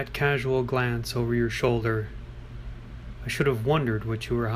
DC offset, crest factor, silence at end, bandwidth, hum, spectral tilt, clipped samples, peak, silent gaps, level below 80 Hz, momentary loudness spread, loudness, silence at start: under 0.1%; 16 dB; 0 s; 15.5 kHz; none; -6.5 dB/octave; under 0.1%; -10 dBFS; none; -42 dBFS; 17 LU; -26 LUFS; 0 s